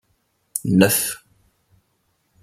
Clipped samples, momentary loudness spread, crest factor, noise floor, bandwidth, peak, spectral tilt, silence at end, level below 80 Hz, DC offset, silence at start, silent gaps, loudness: under 0.1%; 15 LU; 22 dB; -68 dBFS; 16 kHz; 0 dBFS; -4.5 dB/octave; 1.25 s; -58 dBFS; under 0.1%; 0.55 s; none; -19 LUFS